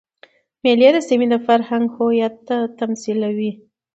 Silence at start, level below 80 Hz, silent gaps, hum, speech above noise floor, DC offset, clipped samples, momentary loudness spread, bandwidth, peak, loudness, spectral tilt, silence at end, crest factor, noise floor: 0.65 s; -68 dBFS; none; none; 35 dB; under 0.1%; under 0.1%; 10 LU; 8 kHz; 0 dBFS; -18 LUFS; -5.5 dB/octave; 0.4 s; 18 dB; -52 dBFS